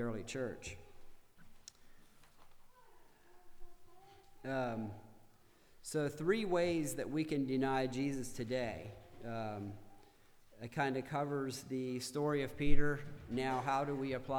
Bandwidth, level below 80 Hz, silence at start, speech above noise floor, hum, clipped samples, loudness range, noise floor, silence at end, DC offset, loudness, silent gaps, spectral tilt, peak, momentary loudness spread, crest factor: 15 kHz; -50 dBFS; 0 s; 29 dB; none; under 0.1%; 10 LU; -64 dBFS; 0 s; under 0.1%; -39 LUFS; none; -5.5 dB/octave; -14 dBFS; 17 LU; 24 dB